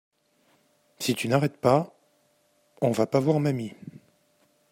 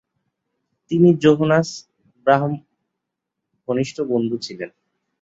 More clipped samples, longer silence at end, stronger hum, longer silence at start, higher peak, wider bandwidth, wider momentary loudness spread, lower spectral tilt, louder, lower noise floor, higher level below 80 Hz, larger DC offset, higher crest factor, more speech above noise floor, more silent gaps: neither; first, 0.8 s vs 0.55 s; neither; about the same, 1 s vs 0.9 s; second, -8 dBFS vs -2 dBFS; first, 16 kHz vs 8 kHz; second, 16 LU vs 19 LU; about the same, -6 dB/octave vs -7 dB/octave; second, -25 LUFS vs -19 LUFS; second, -67 dBFS vs -81 dBFS; second, -68 dBFS vs -62 dBFS; neither; about the same, 20 dB vs 20 dB; second, 43 dB vs 63 dB; neither